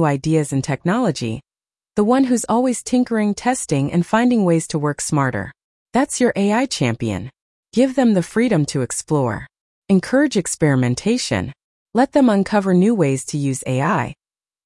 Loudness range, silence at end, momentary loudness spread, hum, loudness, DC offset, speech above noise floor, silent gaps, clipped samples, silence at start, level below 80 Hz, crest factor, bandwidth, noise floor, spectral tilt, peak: 2 LU; 0.55 s; 9 LU; none; -18 LUFS; under 0.1%; over 73 dB; 5.64-5.86 s, 7.41-7.63 s, 9.60-9.82 s, 11.64-11.86 s; under 0.1%; 0 s; -52 dBFS; 14 dB; 12 kHz; under -90 dBFS; -5.5 dB/octave; -4 dBFS